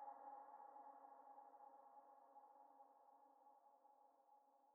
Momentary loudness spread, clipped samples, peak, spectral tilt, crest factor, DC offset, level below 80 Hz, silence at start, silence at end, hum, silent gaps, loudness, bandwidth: 8 LU; under 0.1%; -48 dBFS; 3.5 dB/octave; 16 dB; under 0.1%; under -90 dBFS; 0 s; 0 s; none; none; -64 LUFS; 2.1 kHz